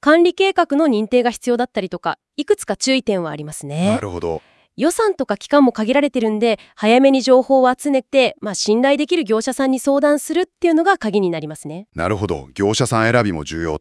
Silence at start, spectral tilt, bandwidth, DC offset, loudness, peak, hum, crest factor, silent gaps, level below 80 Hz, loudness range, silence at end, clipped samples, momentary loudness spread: 0.05 s; -5 dB/octave; 12 kHz; under 0.1%; -17 LUFS; 0 dBFS; none; 16 dB; none; -52 dBFS; 5 LU; 0 s; under 0.1%; 11 LU